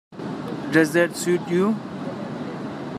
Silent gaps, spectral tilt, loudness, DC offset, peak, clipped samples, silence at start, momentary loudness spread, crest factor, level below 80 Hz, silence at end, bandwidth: none; -5.5 dB/octave; -24 LUFS; under 0.1%; -4 dBFS; under 0.1%; 0.1 s; 13 LU; 20 dB; -68 dBFS; 0 s; 15 kHz